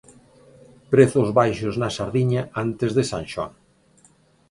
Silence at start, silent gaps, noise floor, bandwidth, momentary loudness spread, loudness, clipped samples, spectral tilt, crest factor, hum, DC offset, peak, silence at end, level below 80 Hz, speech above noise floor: 0.9 s; none; -57 dBFS; 11.5 kHz; 12 LU; -21 LUFS; under 0.1%; -6.5 dB/octave; 20 dB; none; under 0.1%; -2 dBFS; 1 s; -52 dBFS; 37 dB